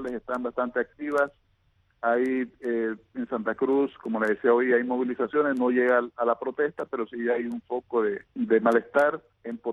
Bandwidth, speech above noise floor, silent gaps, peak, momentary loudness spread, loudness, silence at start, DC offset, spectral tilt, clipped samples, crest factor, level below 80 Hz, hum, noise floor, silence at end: 11.5 kHz; 41 dB; none; -8 dBFS; 10 LU; -26 LUFS; 0 s; under 0.1%; -7 dB/octave; under 0.1%; 18 dB; -68 dBFS; none; -67 dBFS; 0 s